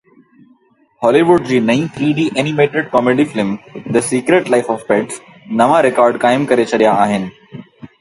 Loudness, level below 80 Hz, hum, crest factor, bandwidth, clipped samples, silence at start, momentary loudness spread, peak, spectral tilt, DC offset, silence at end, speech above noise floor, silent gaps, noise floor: -14 LUFS; -54 dBFS; none; 14 dB; 11.5 kHz; under 0.1%; 1 s; 10 LU; 0 dBFS; -5.5 dB/octave; under 0.1%; 0.15 s; 40 dB; none; -53 dBFS